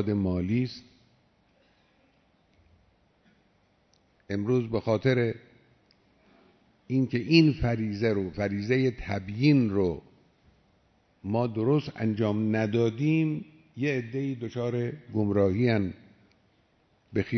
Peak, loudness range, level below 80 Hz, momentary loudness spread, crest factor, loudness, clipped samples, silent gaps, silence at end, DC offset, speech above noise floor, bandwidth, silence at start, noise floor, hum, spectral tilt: -8 dBFS; 7 LU; -54 dBFS; 11 LU; 20 dB; -27 LUFS; under 0.1%; none; 0 s; under 0.1%; 41 dB; 6.4 kHz; 0 s; -67 dBFS; none; -8 dB/octave